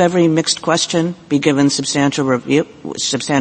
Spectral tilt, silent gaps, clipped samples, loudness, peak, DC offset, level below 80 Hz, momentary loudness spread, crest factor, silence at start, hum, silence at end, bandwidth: -4 dB/octave; none; under 0.1%; -16 LUFS; 0 dBFS; under 0.1%; -56 dBFS; 5 LU; 16 dB; 0 s; none; 0 s; 8.8 kHz